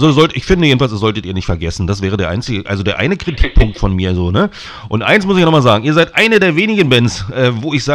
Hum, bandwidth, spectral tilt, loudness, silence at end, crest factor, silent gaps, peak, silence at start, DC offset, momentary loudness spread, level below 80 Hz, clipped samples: none; 14 kHz; -6 dB/octave; -13 LUFS; 0 s; 12 dB; none; 0 dBFS; 0 s; under 0.1%; 9 LU; -24 dBFS; 0.4%